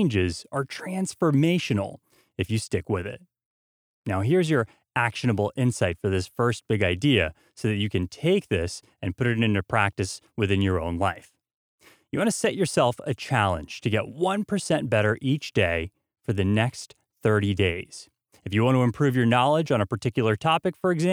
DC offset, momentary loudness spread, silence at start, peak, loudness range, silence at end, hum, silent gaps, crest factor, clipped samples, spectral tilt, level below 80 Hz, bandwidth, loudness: under 0.1%; 10 LU; 0 s; -4 dBFS; 3 LU; 0 s; none; 3.45-4.04 s, 11.54-11.78 s; 20 dB; under 0.1%; -6 dB/octave; -52 dBFS; 15.5 kHz; -25 LUFS